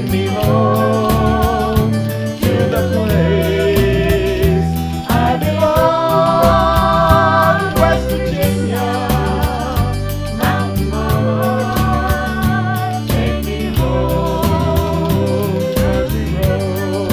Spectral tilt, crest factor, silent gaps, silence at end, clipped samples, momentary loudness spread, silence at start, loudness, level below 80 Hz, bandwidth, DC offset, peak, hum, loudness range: -6.5 dB/octave; 14 dB; none; 0 s; under 0.1%; 6 LU; 0 s; -15 LUFS; -24 dBFS; 16 kHz; under 0.1%; 0 dBFS; none; 4 LU